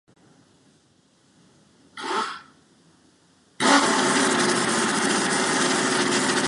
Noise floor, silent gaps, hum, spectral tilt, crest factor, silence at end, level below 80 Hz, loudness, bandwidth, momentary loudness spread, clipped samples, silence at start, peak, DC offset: -61 dBFS; none; none; -2 dB/octave; 22 dB; 0 s; -68 dBFS; -21 LUFS; 11.5 kHz; 10 LU; under 0.1%; 1.95 s; -4 dBFS; under 0.1%